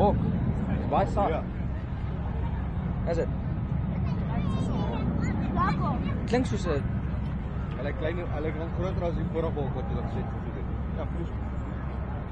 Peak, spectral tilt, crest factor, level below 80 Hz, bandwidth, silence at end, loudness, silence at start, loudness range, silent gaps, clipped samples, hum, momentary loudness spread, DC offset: -10 dBFS; -8.5 dB/octave; 18 dB; -34 dBFS; 8.8 kHz; 0 s; -30 LUFS; 0 s; 3 LU; none; under 0.1%; none; 7 LU; under 0.1%